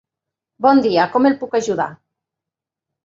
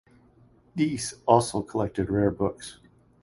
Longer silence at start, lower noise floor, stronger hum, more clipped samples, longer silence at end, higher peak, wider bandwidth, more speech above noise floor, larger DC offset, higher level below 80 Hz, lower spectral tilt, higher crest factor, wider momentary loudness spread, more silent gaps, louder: second, 0.6 s vs 0.75 s; first, -86 dBFS vs -58 dBFS; neither; neither; first, 1.1 s vs 0.5 s; about the same, -2 dBFS vs -4 dBFS; second, 7.8 kHz vs 11.5 kHz; first, 70 dB vs 33 dB; neither; second, -64 dBFS vs -50 dBFS; about the same, -5.5 dB/octave vs -6 dB/octave; second, 18 dB vs 24 dB; second, 8 LU vs 15 LU; neither; first, -17 LUFS vs -26 LUFS